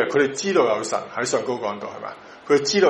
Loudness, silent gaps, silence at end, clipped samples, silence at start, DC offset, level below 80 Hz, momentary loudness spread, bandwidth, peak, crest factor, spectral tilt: -22 LUFS; none; 0 s; under 0.1%; 0 s; under 0.1%; -68 dBFS; 15 LU; 11.5 kHz; -4 dBFS; 18 dB; -3.5 dB/octave